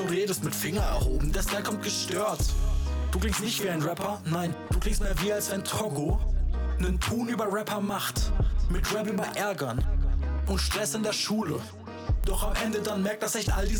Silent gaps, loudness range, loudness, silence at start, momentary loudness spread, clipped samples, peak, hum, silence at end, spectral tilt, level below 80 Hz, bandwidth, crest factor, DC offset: none; 1 LU; -29 LUFS; 0 s; 3 LU; under 0.1%; -18 dBFS; none; 0 s; -4.5 dB/octave; -30 dBFS; over 20 kHz; 8 dB; under 0.1%